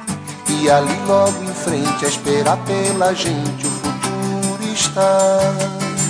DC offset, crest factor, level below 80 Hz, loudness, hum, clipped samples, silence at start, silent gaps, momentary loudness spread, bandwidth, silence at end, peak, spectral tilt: under 0.1%; 16 dB; -52 dBFS; -17 LUFS; none; under 0.1%; 0 s; none; 7 LU; 10.5 kHz; 0 s; -2 dBFS; -4 dB/octave